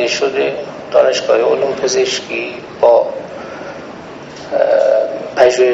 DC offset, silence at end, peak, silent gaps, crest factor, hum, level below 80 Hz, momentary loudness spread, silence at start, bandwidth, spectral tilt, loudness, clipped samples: under 0.1%; 0 s; 0 dBFS; none; 14 dB; none; -56 dBFS; 17 LU; 0 s; 8 kHz; -2 dB/octave; -14 LUFS; under 0.1%